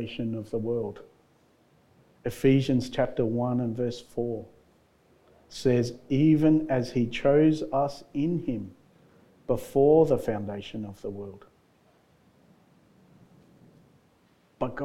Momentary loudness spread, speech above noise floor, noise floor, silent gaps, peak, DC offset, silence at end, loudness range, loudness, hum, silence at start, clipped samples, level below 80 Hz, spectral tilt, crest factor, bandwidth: 16 LU; 38 dB; -64 dBFS; none; -10 dBFS; under 0.1%; 0 s; 10 LU; -27 LUFS; none; 0 s; under 0.1%; -54 dBFS; -7.5 dB/octave; 18 dB; 14 kHz